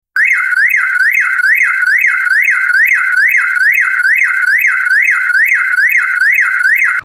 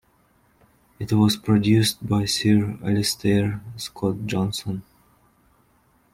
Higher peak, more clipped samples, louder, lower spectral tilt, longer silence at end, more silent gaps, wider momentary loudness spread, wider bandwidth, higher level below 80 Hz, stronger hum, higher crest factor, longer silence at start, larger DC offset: first, 0 dBFS vs -6 dBFS; neither; first, -9 LUFS vs -22 LUFS; second, 2 dB/octave vs -5.5 dB/octave; second, 0 s vs 1.3 s; neither; second, 1 LU vs 13 LU; about the same, 17 kHz vs 16 kHz; second, -62 dBFS vs -52 dBFS; neither; second, 10 dB vs 18 dB; second, 0.15 s vs 1 s; neither